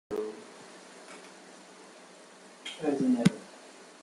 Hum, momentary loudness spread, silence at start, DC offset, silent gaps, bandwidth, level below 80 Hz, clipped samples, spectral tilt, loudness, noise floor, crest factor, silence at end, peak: none; 24 LU; 0.1 s; under 0.1%; none; 12.5 kHz; -74 dBFS; under 0.1%; -6 dB/octave; -30 LUFS; -53 dBFS; 26 dB; 0.1 s; -8 dBFS